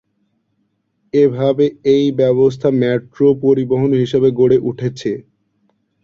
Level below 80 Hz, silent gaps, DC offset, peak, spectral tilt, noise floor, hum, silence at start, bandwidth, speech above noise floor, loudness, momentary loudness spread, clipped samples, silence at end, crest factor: -52 dBFS; none; under 0.1%; -2 dBFS; -8 dB/octave; -66 dBFS; none; 1.15 s; 7.2 kHz; 52 dB; -15 LUFS; 8 LU; under 0.1%; 0.85 s; 14 dB